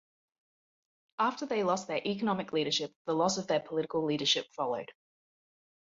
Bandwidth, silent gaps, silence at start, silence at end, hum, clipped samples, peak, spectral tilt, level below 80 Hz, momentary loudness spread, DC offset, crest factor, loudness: 7.8 kHz; 2.96-3.05 s; 1.2 s; 1.05 s; none; under 0.1%; -14 dBFS; -3.5 dB/octave; -76 dBFS; 6 LU; under 0.1%; 20 dB; -32 LUFS